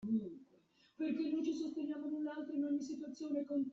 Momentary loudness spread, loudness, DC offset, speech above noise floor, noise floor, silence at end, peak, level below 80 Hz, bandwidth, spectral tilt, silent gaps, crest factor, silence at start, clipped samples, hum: 8 LU; -40 LUFS; under 0.1%; 31 dB; -71 dBFS; 0 s; -26 dBFS; -82 dBFS; 7.4 kHz; -6.5 dB/octave; none; 14 dB; 0 s; under 0.1%; none